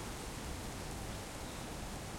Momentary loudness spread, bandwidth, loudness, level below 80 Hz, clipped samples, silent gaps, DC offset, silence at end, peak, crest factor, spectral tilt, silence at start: 1 LU; 16.5 kHz; -44 LUFS; -50 dBFS; under 0.1%; none; under 0.1%; 0 s; -30 dBFS; 14 dB; -4 dB/octave; 0 s